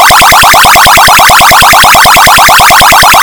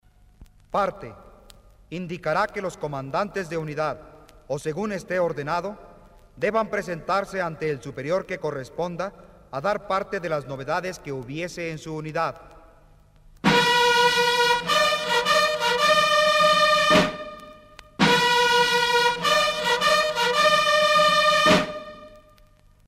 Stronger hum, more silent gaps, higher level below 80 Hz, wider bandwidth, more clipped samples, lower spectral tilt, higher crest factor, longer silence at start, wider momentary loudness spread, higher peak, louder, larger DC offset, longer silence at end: neither; neither; first, -22 dBFS vs -52 dBFS; first, over 20 kHz vs 16 kHz; first, 40% vs under 0.1%; second, -1 dB/octave vs -3 dB/octave; second, 2 dB vs 18 dB; second, 0 s vs 0.4 s; second, 0 LU vs 15 LU; first, 0 dBFS vs -4 dBFS; first, 0 LUFS vs -22 LUFS; first, 4% vs under 0.1%; second, 0 s vs 0.7 s